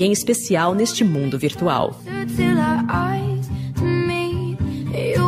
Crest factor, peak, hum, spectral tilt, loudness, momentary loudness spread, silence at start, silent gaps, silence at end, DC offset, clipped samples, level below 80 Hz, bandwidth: 14 dB; -6 dBFS; none; -5.5 dB/octave; -20 LUFS; 7 LU; 0 s; none; 0 s; under 0.1%; under 0.1%; -42 dBFS; 15.5 kHz